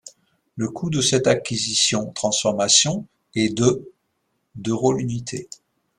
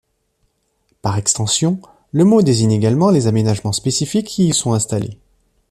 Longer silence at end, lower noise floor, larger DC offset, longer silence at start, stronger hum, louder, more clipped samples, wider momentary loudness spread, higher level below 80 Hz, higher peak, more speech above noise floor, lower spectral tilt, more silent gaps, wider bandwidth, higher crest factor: about the same, 0.55 s vs 0.55 s; first, -72 dBFS vs -65 dBFS; neither; second, 0.05 s vs 1.05 s; neither; second, -20 LUFS vs -16 LUFS; neither; first, 15 LU vs 10 LU; second, -56 dBFS vs -50 dBFS; about the same, -2 dBFS vs -2 dBFS; about the same, 51 dB vs 50 dB; second, -3.5 dB/octave vs -5.5 dB/octave; neither; about the same, 13 kHz vs 13.5 kHz; first, 22 dB vs 16 dB